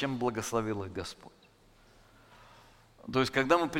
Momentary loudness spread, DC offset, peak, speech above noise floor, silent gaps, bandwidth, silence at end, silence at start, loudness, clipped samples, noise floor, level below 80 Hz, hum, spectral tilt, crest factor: 18 LU; under 0.1%; -10 dBFS; 30 dB; none; 16.5 kHz; 0 s; 0 s; -32 LUFS; under 0.1%; -61 dBFS; -60 dBFS; none; -5 dB/octave; 24 dB